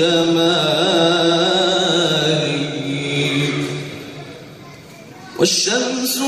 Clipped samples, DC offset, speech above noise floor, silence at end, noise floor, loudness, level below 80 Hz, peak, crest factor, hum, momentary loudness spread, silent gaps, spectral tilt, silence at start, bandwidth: under 0.1%; under 0.1%; 22 dB; 0 s; -38 dBFS; -16 LUFS; -58 dBFS; -2 dBFS; 16 dB; none; 17 LU; none; -3.5 dB/octave; 0 s; 15 kHz